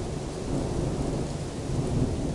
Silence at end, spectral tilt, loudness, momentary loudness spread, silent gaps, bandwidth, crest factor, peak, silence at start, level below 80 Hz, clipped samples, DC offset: 0 s; -6.5 dB/octave; -30 LUFS; 5 LU; none; 11.5 kHz; 14 dB; -14 dBFS; 0 s; -38 dBFS; under 0.1%; under 0.1%